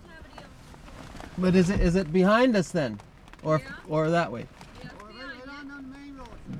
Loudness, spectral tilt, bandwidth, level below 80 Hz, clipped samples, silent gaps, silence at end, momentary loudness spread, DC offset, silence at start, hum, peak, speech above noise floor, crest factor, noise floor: -25 LUFS; -6.5 dB/octave; 11.5 kHz; -42 dBFS; under 0.1%; none; 0 s; 23 LU; under 0.1%; 0.1 s; none; -10 dBFS; 23 dB; 18 dB; -47 dBFS